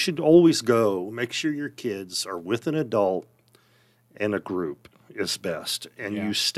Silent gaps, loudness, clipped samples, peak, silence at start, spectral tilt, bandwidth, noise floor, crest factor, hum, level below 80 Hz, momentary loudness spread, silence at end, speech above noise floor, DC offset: none; -25 LUFS; under 0.1%; -4 dBFS; 0 s; -4.5 dB/octave; 15 kHz; -62 dBFS; 20 dB; none; -70 dBFS; 14 LU; 0 s; 37 dB; under 0.1%